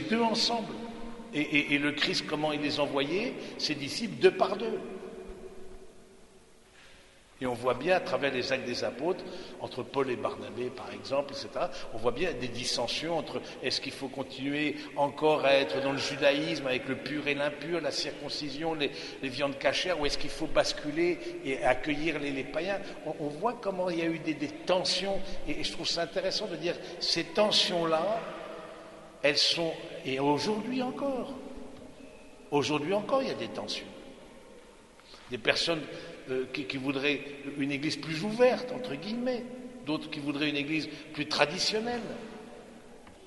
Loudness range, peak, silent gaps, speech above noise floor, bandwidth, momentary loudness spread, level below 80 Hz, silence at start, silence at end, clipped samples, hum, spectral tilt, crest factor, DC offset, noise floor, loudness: 5 LU; -6 dBFS; none; 26 dB; 11.5 kHz; 15 LU; -54 dBFS; 0 s; 0 s; under 0.1%; none; -4 dB/octave; 26 dB; under 0.1%; -57 dBFS; -31 LUFS